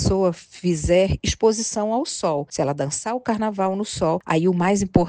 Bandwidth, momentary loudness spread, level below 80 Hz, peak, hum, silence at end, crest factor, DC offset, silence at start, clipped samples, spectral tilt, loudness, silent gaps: 10 kHz; 6 LU; -38 dBFS; 0 dBFS; none; 0 s; 20 dB; under 0.1%; 0 s; under 0.1%; -5 dB/octave; -22 LUFS; none